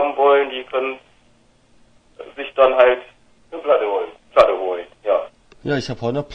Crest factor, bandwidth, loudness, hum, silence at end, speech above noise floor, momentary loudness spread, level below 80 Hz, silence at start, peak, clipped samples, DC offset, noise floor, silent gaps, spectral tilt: 20 dB; 9.2 kHz; -18 LUFS; none; 0 s; 37 dB; 17 LU; -54 dBFS; 0 s; 0 dBFS; under 0.1%; under 0.1%; -55 dBFS; none; -6 dB/octave